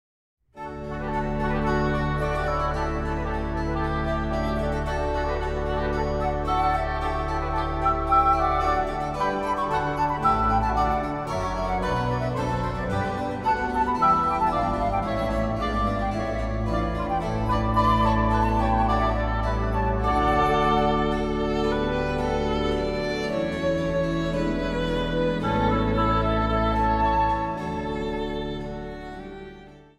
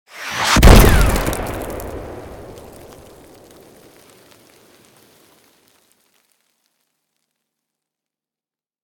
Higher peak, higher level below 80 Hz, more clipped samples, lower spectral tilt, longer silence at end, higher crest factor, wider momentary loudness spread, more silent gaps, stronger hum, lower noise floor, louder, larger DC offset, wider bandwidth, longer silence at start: second, -8 dBFS vs 0 dBFS; second, -32 dBFS vs -22 dBFS; neither; first, -7 dB/octave vs -4.5 dB/octave; second, 0.2 s vs 6.35 s; about the same, 16 dB vs 18 dB; second, 7 LU vs 28 LU; neither; neither; second, -45 dBFS vs under -90 dBFS; second, -25 LUFS vs -14 LUFS; neither; second, 12 kHz vs 19 kHz; first, 0.55 s vs 0.15 s